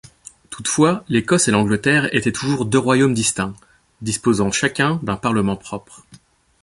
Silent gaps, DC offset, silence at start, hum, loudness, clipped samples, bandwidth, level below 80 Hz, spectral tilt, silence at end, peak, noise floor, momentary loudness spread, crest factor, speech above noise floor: none; under 0.1%; 0.5 s; none; -18 LUFS; under 0.1%; 11.5 kHz; -48 dBFS; -4.5 dB/octave; 0.65 s; -2 dBFS; -50 dBFS; 11 LU; 18 dB; 32 dB